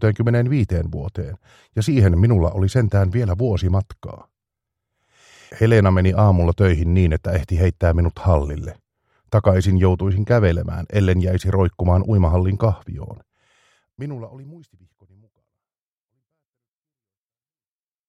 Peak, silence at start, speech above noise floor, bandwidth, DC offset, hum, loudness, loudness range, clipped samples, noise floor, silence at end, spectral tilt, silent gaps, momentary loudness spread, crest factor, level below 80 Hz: -2 dBFS; 0 s; over 72 dB; 10 kHz; under 0.1%; none; -18 LUFS; 12 LU; under 0.1%; under -90 dBFS; 3.5 s; -8.5 dB/octave; none; 16 LU; 18 dB; -32 dBFS